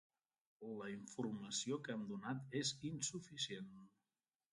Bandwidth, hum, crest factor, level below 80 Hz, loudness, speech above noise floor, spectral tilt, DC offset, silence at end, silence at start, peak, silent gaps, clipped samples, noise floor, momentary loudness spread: 11.5 kHz; none; 18 dB; -82 dBFS; -45 LUFS; over 44 dB; -3.5 dB/octave; under 0.1%; 0.65 s; 0.6 s; -30 dBFS; none; under 0.1%; under -90 dBFS; 10 LU